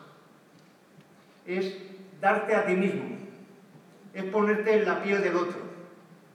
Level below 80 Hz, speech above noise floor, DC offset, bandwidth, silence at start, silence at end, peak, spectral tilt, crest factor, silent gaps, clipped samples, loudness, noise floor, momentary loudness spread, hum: under -90 dBFS; 31 dB; under 0.1%; 11.5 kHz; 0 s; 0.2 s; -10 dBFS; -6.5 dB/octave; 20 dB; none; under 0.1%; -27 LUFS; -57 dBFS; 20 LU; none